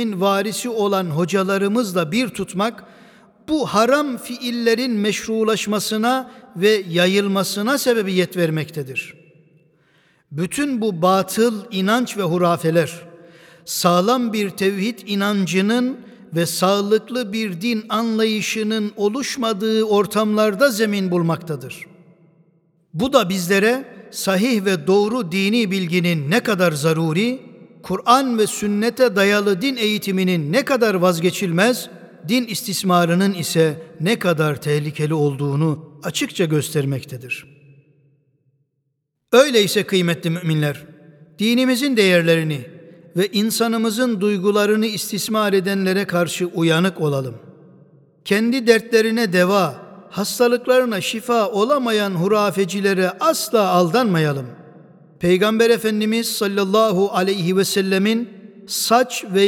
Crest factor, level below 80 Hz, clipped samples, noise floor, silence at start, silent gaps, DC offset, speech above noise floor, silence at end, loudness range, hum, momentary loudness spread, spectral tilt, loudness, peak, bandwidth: 18 dB; -62 dBFS; under 0.1%; -73 dBFS; 0 s; none; under 0.1%; 55 dB; 0 s; 3 LU; none; 9 LU; -5 dB/octave; -19 LUFS; 0 dBFS; 18.5 kHz